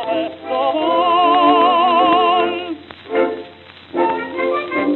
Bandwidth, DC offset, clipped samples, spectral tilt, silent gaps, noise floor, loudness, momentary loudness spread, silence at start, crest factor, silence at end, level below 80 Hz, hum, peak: 4.3 kHz; under 0.1%; under 0.1%; -7 dB/octave; none; -40 dBFS; -16 LUFS; 12 LU; 0 s; 14 dB; 0 s; -64 dBFS; none; -2 dBFS